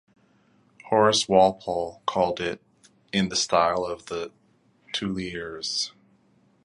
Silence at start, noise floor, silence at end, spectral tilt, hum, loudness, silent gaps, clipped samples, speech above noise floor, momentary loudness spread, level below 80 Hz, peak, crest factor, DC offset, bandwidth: 0.85 s; -62 dBFS; 0.75 s; -3.5 dB/octave; none; -25 LUFS; none; under 0.1%; 38 dB; 13 LU; -58 dBFS; -4 dBFS; 24 dB; under 0.1%; 11.5 kHz